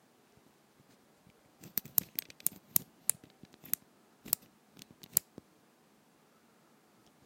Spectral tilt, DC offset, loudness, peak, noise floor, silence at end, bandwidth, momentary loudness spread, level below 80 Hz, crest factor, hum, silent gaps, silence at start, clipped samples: -1 dB/octave; under 0.1%; -34 LUFS; -4 dBFS; -66 dBFS; 2.05 s; 16.5 kHz; 25 LU; -78 dBFS; 38 dB; none; none; 2 s; under 0.1%